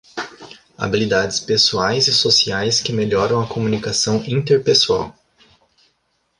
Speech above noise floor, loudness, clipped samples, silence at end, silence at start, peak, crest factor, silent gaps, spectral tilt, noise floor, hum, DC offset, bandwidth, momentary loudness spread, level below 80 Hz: 49 dB; -16 LUFS; under 0.1%; 1.3 s; 0.15 s; -2 dBFS; 16 dB; none; -3.5 dB/octave; -67 dBFS; none; under 0.1%; 11.5 kHz; 9 LU; -50 dBFS